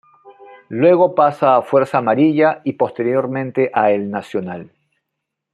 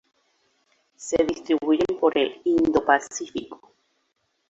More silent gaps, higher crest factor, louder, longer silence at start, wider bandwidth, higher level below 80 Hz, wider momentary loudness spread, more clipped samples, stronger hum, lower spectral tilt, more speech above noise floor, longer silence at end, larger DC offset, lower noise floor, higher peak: neither; second, 16 dB vs 22 dB; first, -16 LUFS vs -23 LUFS; second, 0.25 s vs 1 s; first, 10 kHz vs 8.2 kHz; second, -66 dBFS vs -56 dBFS; about the same, 12 LU vs 13 LU; neither; neither; first, -8.5 dB/octave vs -4 dB/octave; first, 63 dB vs 50 dB; about the same, 0.85 s vs 0.95 s; neither; first, -78 dBFS vs -73 dBFS; about the same, -2 dBFS vs -4 dBFS